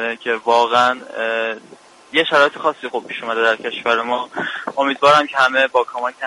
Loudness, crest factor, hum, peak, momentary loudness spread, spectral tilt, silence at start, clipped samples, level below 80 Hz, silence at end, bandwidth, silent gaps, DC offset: -17 LUFS; 18 dB; none; 0 dBFS; 11 LU; -3 dB/octave; 0 s; under 0.1%; -66 dBFS; 0 s; 11.5 kHz; none; under 0.1%